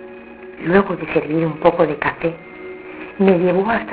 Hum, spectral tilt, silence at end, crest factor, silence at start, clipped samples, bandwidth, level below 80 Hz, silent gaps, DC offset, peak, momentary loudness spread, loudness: none; -11 dB/octave; 0 s; 18 dB; 0 s; under 0.1%; 4 kHz; -48 dBFS; none; under 0.1%; 0 dBFS; 18 LU; -18 LUFS